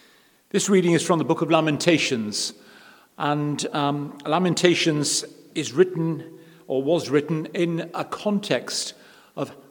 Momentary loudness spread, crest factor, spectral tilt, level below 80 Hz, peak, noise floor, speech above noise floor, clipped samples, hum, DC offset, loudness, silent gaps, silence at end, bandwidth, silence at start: 11 LU; 24 dB; -4.5 dB/octave; -74 dBFS; 0 dBFS; -57 dBFS; 34 dB; under 0.1%; none; under 0.1%; -23 LUFS; none; 0.15 s; 19 kHz; 0.55 s